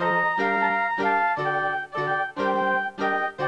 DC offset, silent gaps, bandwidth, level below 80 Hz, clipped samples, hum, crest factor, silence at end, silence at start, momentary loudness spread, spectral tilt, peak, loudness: under 0.1%; none; 10.5 kHz; -66 dBFS; under 0.1%; none; 12 dB; 0 s; 0 s; 4 LU; -6 dB/octave; -12 dBFS; -24 LUFS